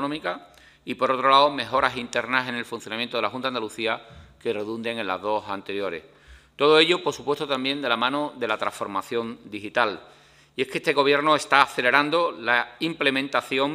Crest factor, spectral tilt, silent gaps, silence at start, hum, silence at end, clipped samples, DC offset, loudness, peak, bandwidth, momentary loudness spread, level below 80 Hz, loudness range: 24 dB; -3.5 dB/octave; none; 0 s; none; 0 s; under 0.1%; under 0.1%; -23 LUFS; 0 dBFS; 15.5 kHz; 13 LU; -62 dBFS; 7 LU